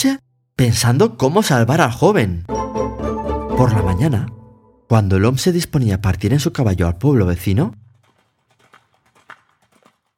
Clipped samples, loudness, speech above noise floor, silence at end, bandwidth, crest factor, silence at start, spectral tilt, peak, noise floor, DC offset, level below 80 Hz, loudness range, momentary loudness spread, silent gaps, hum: under 0.1%; -17 LUFS; 46 dB; 2.45 s; 16.5 kHz; 18 dB; 0 s; -6 dB/octave; 0 dBFS; -61 dBFS; under 0.1%; -36 dBFS; 4 LU; 9 LU; none; none